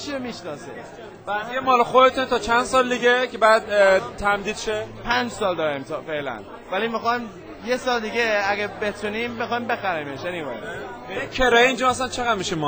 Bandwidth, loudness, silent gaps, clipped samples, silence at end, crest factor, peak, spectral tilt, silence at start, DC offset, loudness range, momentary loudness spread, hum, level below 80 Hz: over 20 kHz; -21 LUFS; none; under 0.1%; 0 s; 20 dB; -2 dBFS; -3.5 dB/octave; 0 s; under 0.1%; 7 LU; 15 LU; none; -46 dBFS